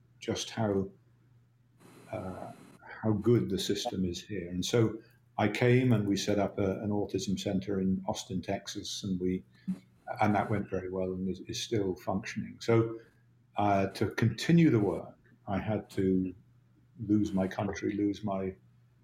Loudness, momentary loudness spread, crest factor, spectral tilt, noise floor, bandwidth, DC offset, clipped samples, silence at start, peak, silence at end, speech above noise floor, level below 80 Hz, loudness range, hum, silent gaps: -31 LUFS; 14 LU; 18 dB; -6 dB/octave; -64 dBFS; 15 kHz; under 0.1%; under 0.1%; 0.2 s; -12 dBFS; 0.5 s; 34 dB; -64 dBFS; 4 LU; none; none